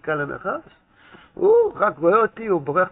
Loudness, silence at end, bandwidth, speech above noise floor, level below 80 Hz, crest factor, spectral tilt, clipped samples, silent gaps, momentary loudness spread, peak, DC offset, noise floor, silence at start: -20 LUFS; 0 s; 4 kHz; 30 dB; -58 dBFS; 16 dB; -6 dB/octave; under 0.1%; none; 11 LU; -6 dBFS; under 0.1%; -50 dBFS; 0.05 s